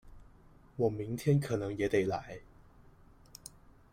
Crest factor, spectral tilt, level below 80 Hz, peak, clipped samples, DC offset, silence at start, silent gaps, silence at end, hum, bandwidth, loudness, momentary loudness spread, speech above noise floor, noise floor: 20 dB; -7 dB/octave; -58 dBFS; -16 dBFS; under 0.1%; under 0.1%; 0.05 s; none; 0.45 s; none; 16 kHz; -33 LUFS; 20 LU; 27 dB; -59 dBFS